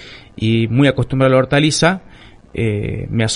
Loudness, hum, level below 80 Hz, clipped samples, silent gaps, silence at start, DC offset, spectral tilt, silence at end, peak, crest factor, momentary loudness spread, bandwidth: -16 LUFS; none; -40 dBFS; under 0.1%; none; 0 s; under 0.1%; -5.5 dB/octave; 0 s; 0 dBFS; 16 dB; 11 LU; 11 kHz